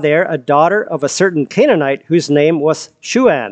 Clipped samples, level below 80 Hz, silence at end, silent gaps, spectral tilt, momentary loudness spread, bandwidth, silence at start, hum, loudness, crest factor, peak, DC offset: under 0.1%; -60 dBFS; 0 s; none; -5 dB/octave; 5 LU; 9.2 kHz; 0 s; none; -13 LUFS; 12 dB; 0 dBFS; under 0.1%